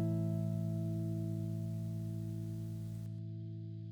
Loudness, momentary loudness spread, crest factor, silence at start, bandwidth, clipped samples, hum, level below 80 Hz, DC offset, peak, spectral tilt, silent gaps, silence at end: -40 LUFS; 8 LU; 12 dB; 0 s; 18.5 kHz; under 0.1%; 50 Hz at -60 dBFS; -64 dBFS; under 0.1%; -28 dBFS; -9.5 dB/octave; none; 0 s